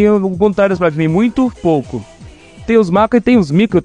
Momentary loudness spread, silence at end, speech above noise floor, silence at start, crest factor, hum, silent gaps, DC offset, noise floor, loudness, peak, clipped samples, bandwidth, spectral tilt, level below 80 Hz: 6 LU; 0 s; 25 dB; 0 s; 12 dB; none; none; 0.2%; -37 dBFS; -13 LUFS; 0 dBFS; under 0.1%; 10 kHz; -8 dB/octave; -40 dBFS